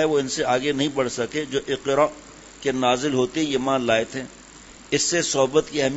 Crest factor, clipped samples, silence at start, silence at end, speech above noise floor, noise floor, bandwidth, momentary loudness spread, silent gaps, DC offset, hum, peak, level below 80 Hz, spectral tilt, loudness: 18 dB; under 0.1%; 0 s; 0 s; 23 dB; -45 dBFS; 8 kHz; 7 LU; none; under 0.1%; none; -4 dBFS; -54 dBFS; -3.5 dB/octave; -22 LUFS